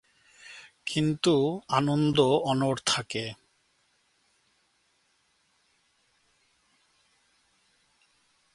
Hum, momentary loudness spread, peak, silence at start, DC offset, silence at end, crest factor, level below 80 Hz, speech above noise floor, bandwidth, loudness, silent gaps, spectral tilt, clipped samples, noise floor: none; 22 LU; -8 dBFS; 0.45 s; under 0.1%; 5.2 s; 24 dB; -66 dBFS; 45 dB; 11.5 kHz; -26 LUFS; none; -5 dB/octave; under 0.1%; -70 dBFS